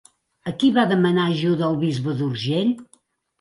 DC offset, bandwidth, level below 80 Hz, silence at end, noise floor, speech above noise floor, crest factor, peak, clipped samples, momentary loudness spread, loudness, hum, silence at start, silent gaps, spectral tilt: under 0.1%; 11.5 kHz; -62 dBFS; 0.55 s; -60 dBFS; 40 dB; 16 dB; -6 dBFS; under 0.1%; 9 LU; -21 LUFS; none; 0.45 s; none; -7 dB/octave